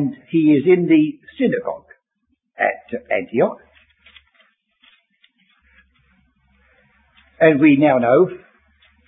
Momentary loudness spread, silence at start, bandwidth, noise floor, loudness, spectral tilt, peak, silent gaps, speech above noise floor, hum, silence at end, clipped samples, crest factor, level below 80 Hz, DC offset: 15 LU; 0 s; 3.9 kHz; -70 dBFS; -17 LUFS; -12 dB/octave; -2 dBFS; none; 54 dB; none; 0.7 s; under 0.1%; 18 dB; -62 dBFS; under 0.1%